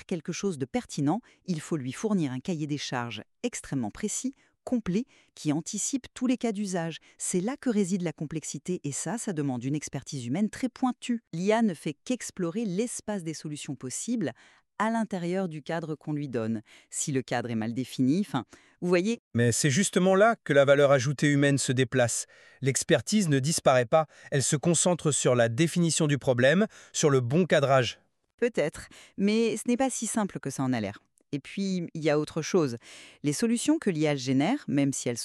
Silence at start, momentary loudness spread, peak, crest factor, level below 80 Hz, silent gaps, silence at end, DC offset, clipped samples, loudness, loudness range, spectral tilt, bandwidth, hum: 0.1 s; 11 LU; -8 dBFS; 20 dB; -66 dBFS; 19.19-19.31 s, 28.34-28.38 s; 0 s; under 0.1%; under 0.1%; -28 LUFS; 8 LU; -5 dB/octave; 13 kHz; none